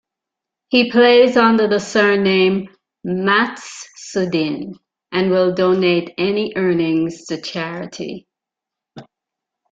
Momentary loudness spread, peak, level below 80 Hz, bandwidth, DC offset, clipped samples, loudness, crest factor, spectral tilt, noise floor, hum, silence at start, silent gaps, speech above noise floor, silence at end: 18 LU; -2 dBFS; -60 dBFS; 7.8 kHz; under 0.1%; under 0.1%; -16 LUFS; 16 dB; -5.5 dB/octave; -85 dBFS; none; 0.7 s; none; 69 dB; 0.7 s